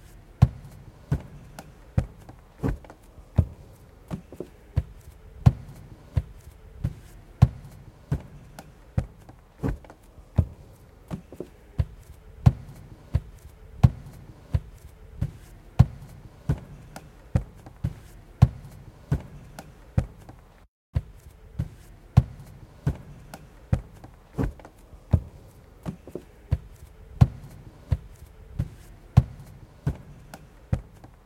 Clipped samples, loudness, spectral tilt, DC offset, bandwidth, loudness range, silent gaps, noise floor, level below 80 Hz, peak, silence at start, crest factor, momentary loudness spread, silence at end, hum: under 0.1%; -29 LUFS; -8.5 dB/octave; under 0.1%; 13.5 kHz; 5 LU; 20.68-20.93 s; -50 dBFS; -38 dBFS; -2 dBFS; 0.4 s; 28 dB; 26 LU; 0.45 s; none